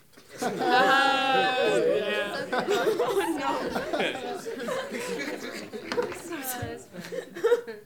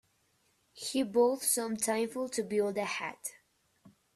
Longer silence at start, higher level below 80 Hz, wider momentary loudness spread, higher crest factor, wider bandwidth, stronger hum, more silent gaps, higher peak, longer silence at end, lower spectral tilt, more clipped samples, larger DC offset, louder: second, 0.15 s vs 0.75 s; first, -64 dBFS vs -76 dBFS; about the same, 14 LU vs 12 LU; about the same, 20 dB vs 18 dB; first, 19.5 kHz vs 15.5 kHz; neither; neither; first, -8 dBFS vs -16 dBFS; second, 0 s vs 0.25 s; about the same, -3.5 dB/octave vs -3 dB/octave; neither; first, 0.1% vs under 0.1%; first, -27 LUFS vs -32 LUFS